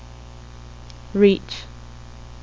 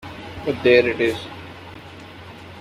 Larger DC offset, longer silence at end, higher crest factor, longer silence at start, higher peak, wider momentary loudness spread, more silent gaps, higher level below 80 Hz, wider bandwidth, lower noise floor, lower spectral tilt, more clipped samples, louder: first, 0.4% vs under 0.1%; about the same, 0.1 s vs 0 s; about the same, 22 dB vs 20 dB; first, 0.65 s vs 0.05 s; about the same, -2 dBFS vs -2 dBFS; about the same, 25 LU vs 24 LU; neither; first, -42 dBFS vs -52 dBFS; second, 7.6 kHz vs 13.5 kHz; about the same, -40 dBFS vs -39 dBFS; about the same, -6.5 dB/octave vs -6 dB/octave; neither; about the same, -20 LUFS vs -19 LUFS